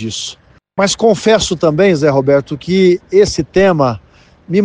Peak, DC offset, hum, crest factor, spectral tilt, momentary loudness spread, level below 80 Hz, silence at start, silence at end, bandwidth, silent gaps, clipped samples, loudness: 0 dBFS; under 0.1%; none; 12 dB; -5 dB/octave; 11 LU; -40 dBFS; 0 s; 0 s; 10 kHz; none; under 0.1%; -12 LUFS